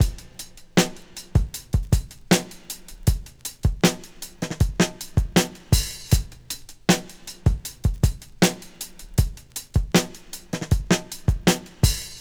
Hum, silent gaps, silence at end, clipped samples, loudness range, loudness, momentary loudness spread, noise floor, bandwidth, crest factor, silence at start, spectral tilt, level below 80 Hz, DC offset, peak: none; none; 0 s; under 0.1%; 1 LU; -24 LUFS; 14 LU; -42 dBFS; over 20 kHz; 22 dB; 0 s; -4.5 dB/octave; -30 dBFS; 0.1%; 0 dBFS